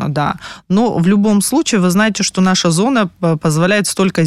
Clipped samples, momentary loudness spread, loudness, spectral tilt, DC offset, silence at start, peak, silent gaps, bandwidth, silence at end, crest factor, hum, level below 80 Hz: under 0.1%; 5 LU; -14 LUFS; -5 dB/octave; under 0.1%; 0 s; -2 dBFS; none; 13.5 kHz; 0 s; 12 dB; none; -48 dBFS